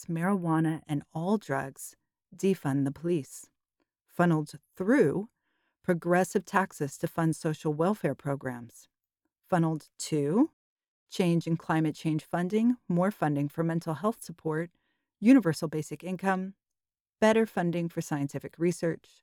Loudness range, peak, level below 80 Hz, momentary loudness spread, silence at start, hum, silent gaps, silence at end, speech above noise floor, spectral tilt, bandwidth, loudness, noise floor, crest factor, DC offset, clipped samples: 4 LU; -10 dBFS; -72 dBFS; 11 LU; 0 s; none; 10.53-10.77 s, 10.88-11.07 s, 17.01-17.05 s; 0.25 s; over 62 dB; -6.5 dB/octave; 17 kHz; -29 LUFS; under -90 dBFS; 20 dB; under 0.1%; under 0.1%